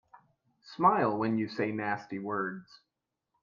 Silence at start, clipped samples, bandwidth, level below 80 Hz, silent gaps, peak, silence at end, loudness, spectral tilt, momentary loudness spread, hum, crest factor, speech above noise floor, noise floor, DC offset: 0.15 s; under 0.1%; 7.2 kHz; -72 dBFS; none; -12 dBFS; 0.8 s; -30 LUFS; -8 dB/octave; 12 LU; none; 22 dB; 55 dB; -85 dBFS; under 0.1%